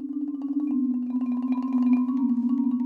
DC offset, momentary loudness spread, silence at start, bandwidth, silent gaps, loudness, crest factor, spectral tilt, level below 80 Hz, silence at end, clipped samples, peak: under 0.1%; 6 LU; 0 s; 3 kHz; none; -25 LUFS; 12 dB; -9 dB/octave; -76 dBFS; 0 s; under 0.1%; -14 dBFS